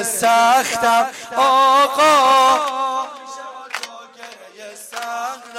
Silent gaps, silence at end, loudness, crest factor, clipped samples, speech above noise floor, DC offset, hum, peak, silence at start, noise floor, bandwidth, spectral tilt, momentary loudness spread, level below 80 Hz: none; 0 s; -15 LUFS; 12 dB; under 0.1%; 24 dB; under 0.1%; none; -4 dBFS; 0 s; -39 dBFS; 16.5 kHz; -1 dB/octave; 20 LU; -62 dBFS